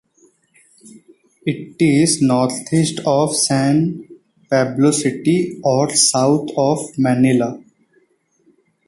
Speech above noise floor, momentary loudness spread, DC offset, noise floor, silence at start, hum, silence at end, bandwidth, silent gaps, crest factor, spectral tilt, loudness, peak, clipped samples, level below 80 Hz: 44 dB; 11 LU; under 0.1%; -60 dBFS; 0.85 s; none; 1.3 s; 12 kHz; none; 16 dB; -4.5 dB/octave; -16 LUFS; -2 dBFS; under 0.1%; -56 dBFS